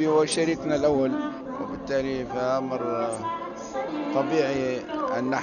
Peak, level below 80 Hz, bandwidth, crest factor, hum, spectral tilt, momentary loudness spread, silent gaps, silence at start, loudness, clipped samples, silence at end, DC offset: -10 dBFS; -56 dBFS; 7.2 kHz; 16 dB; none; -4.5 dB/octave; 10 LU; none; 0 s; -27 LUFS; under 0.1%; 0 s; under 0.1%